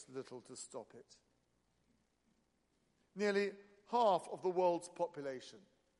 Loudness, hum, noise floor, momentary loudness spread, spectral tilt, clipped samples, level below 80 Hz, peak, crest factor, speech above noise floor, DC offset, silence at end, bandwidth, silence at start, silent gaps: -38 LUFS; none; -80 dBFS; 18 LU; -4.5 dB/octave; under 0.1%; -86 dBFS; -22 dBFS; 20 dB; 41 dB; under 0.1%; 0.4 s; 11.5 kHz; 0 s; none